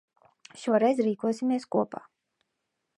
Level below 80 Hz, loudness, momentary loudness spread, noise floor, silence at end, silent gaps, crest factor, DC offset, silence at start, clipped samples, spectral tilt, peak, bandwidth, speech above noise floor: -82 dBFS; -27 LUFS; 12 LU; -81 dBFS; 1 s; none; 20 dB; under 0.1%; 0.55 s; under 0.1%; -6.5 dB/octave; -10 dBFS; 11.5 kHz; 55 dB